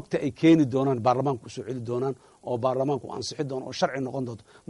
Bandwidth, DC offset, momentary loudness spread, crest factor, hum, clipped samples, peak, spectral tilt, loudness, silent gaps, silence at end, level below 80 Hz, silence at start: 11 kHz; under 0.1%; 14 LU; 16 dB; none; under 0.1%; -10 dBFS; -6.5 dB/octave; -26 LUFS; none; 0.35 s; -66 dBFS; 0 s